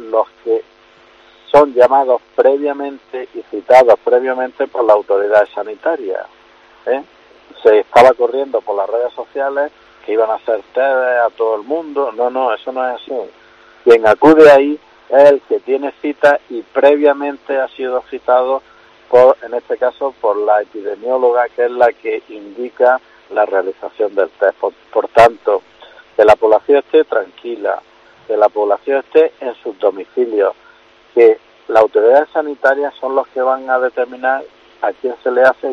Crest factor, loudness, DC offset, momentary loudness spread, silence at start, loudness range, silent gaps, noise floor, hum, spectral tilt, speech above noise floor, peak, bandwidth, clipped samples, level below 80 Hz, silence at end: 14 dB; -14 LUFS; under 0.1%; 13 LU; 0 s; 6 LU; none; -46 dBFS; none; -5.5 dB/octave; 33 dB; 0 dBFS; 9 kHz; 0.4%; -56 dBFS; 0 s